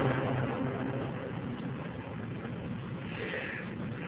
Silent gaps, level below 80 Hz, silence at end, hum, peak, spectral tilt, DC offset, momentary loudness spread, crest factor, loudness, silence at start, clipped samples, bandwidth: none; -56 dBFS; 0 s; none; -16 dBFS; -6 dB/octave; under 0.1%; 7 LU; 18 dB; -36 LUFS; 0 s; under 0.1%; 4 kHz